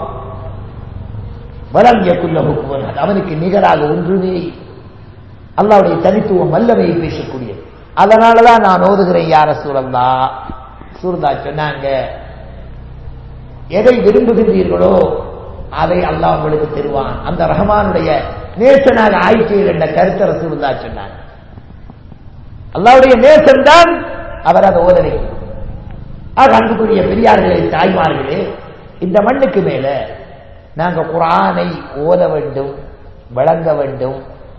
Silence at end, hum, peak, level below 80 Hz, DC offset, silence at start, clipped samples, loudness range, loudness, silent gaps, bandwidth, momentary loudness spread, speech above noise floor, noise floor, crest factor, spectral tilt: 0.05 s; none; 0 dBFS; -32 dBFS; 0.6%; 0 s; 2%; 7 LU; -11 LUFS; none; 8 kHz; 21 LU; 24 dB; -35 dBFS; 12 dB; -7 dB/octave